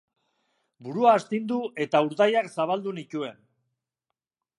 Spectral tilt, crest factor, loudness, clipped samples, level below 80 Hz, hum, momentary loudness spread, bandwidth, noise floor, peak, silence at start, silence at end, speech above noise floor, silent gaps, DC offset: -6 dB/octave; 20 dB; -25 LUFS; under 0.1%; -80 dBFS; none; 14 LU; 11.5 kHz; -86 dBFS; -6 dBFS; 0.8 s; 1.25 s; 61 dB; none; under 0.1%